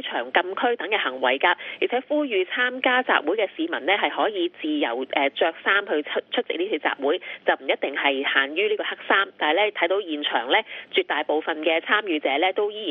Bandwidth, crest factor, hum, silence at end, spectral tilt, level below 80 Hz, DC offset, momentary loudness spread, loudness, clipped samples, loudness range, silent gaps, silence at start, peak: 4.7 kHz; 20 dB; none; 0 s; -5.5 dB/octave; -78 dBFS; under 0.1%; 5 LU; -23 LUFS; under 0.1%; 2 LU; none; 0 s; -4 dBFS